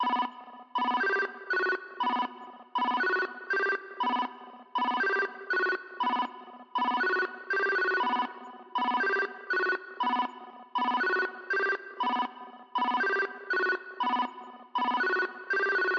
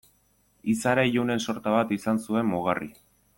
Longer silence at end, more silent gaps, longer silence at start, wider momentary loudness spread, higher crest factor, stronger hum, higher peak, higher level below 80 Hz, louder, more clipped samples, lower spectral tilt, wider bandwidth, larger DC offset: second, 0 s vs 0.45 s; neither; second, 0 s vs 0.65 s; about the same, 9 LU vs 8 LU; about the same, 14 dB vs 18 dB; neither; second, -18 dBFS vs -8 dBFS; second, under -90 dBFS vs -62 dBFS; second, -30 LUFS vs -26 LUFS; neither; second, -3 dB/octave vs -5.5 dB/octave; second, 6.6 kHz vs 17 kHz; neither